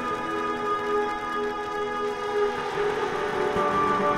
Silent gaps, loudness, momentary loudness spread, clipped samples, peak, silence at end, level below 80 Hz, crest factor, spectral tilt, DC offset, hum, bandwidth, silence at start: none; -26 LUFS; 5 LU; under 0.1%; -12 dBFS; 0 s; -54 dBFS; 14 dB; -5 dB/octave; under 0.1%; none; 13.5 kHz; 0 s